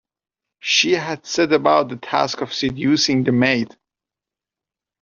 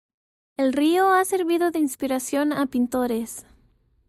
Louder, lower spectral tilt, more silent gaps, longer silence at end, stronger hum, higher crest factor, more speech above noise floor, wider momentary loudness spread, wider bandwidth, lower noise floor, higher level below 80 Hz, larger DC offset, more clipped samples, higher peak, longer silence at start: first, -18 LUFS vs -22 LUFS; about the same, -3 dB/octave vs -3.5 dB/octave; neither; first, 1.35 s vs 0.65 s; neither; about the same, 18 dB vs 14 dB; first, 70 dB vs 40 dB; second, 7 LU vs 10 LU; second, 7.4 kHz vs 16 kHz; first, -88 dBFS vs -61 dBFS; about the same, -56 dBFS vs -60 dBFS; neither; neither; first, -2 dBFS vs -10 dBFS; about the same, 0.65 s vs 0.6 s